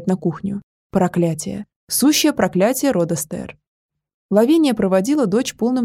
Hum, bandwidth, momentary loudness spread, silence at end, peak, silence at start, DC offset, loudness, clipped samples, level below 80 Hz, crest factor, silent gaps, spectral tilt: none; 16 kHz; 13 LU; 0 s; -2 dBFS; 0 s; under 0.1%; -18 LUFS; under 0.1%; -52 dBFS; 18 dB; 0.63-0.90 s, 1.76-1.87 s, 3.67-3.89 s, 4.14-4.29 s; -5 dB/octave